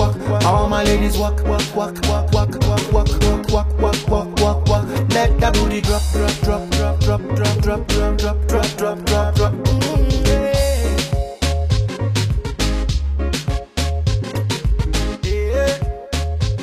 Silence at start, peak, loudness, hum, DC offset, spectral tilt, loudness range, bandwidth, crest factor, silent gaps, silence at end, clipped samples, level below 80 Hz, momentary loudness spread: 0 s; -2 dBFS; -18 LUFS; none; under 0.1%; -5.5 dB/octave; 3 LU; 15 kHz; 14 dB; none; 0 s; under 0.1%; -20 dBFS; 5 LU